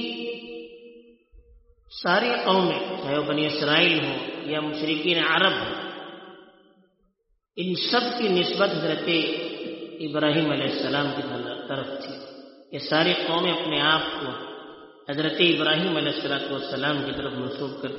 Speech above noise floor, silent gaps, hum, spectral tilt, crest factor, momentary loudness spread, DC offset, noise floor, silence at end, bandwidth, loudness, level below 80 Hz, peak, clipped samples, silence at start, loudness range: 46 dB; none; none; -2 dB/octave; 20 dB; 17 LU; under 0.1%; -71 dBFS; 0 s; 6 kHz; -24 LUFS; -62 dBFS; -6 dBFS; under 0.1%; 0 s; 4 LU